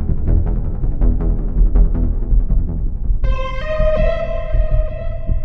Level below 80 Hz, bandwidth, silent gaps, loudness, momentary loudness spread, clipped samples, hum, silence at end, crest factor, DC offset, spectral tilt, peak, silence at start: -16 dBFS; 4 kHz; none; -20 LUFS; 6 LU; under 0.1%; none; 0 s; 12 dB; under 0.1%; -9.5 dB/octave; -2 dBFS; 0 s